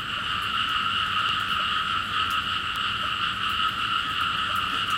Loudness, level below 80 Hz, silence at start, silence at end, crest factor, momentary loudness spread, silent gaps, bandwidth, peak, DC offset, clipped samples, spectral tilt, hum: -24 LUFS; -50 dBFS; 0 s; 0 s; 14 dB; 2 LU; none; 17 kHz; -12 dBFS; under 0.1%; under 0.1%; -2 dB/octave; none